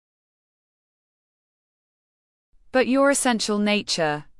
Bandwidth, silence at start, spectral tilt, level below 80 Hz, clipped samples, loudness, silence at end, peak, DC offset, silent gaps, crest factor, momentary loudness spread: 12 kHz; 2.75 s; -3.5 dB/octave; -60 dBFS; under 0.1%; -21 LUFS; 0.15 s; -8 dBFS; under 0.1%; none; 18 dB; 5 LU